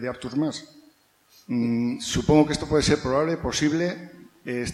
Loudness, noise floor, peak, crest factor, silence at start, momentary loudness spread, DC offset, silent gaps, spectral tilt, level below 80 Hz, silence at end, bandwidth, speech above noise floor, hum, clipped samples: -24 LUFS; -59 dBFS; -4 dBFS; 20 dB; 0 s; 11 LU; under 0.1%; none; -5 dB/octave; -44 dBFS; 0 s; 13.5 kHz; 35 dB; none; under 0.1%